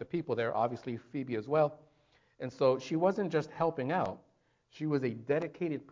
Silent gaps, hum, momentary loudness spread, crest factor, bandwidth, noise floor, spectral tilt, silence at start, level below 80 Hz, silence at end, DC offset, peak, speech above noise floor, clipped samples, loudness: none; none; 10 LU; 18 dB; 7.6 kHz; -69 dBFS; -7.5 dB/octave; 0 s; -70 dBFS; 0.1 s; under 0.1%; -16 dBFS; 37 dB; under 0.1%; -33 LUFS